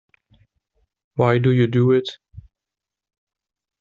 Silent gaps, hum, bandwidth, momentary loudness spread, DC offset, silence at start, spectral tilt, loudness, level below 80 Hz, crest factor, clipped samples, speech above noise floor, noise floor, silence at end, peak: none; none; 7.2 kHz; 13 LU; under 0.1%; 1.15 s; -7 dB/octave; -18 LUFS; -56 dBFS; 18 dB; under 0.1%; 70 dB; -87 dBFS; 1.4 s; -4 dBFS